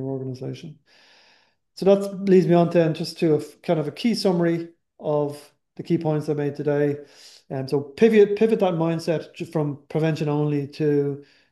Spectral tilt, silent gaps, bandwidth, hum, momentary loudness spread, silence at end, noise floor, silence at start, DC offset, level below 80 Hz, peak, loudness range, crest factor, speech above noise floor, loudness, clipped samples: -7.5 dB/octave; none; 12.5 kHz; none; 15 LU; 0.3 s; -61 dBFS; 0 s; under 0.1%; -70 dBFS; -4 dBFS; 4 LU; 18 dB; 39 dB; -22 LUFS; under 0.1%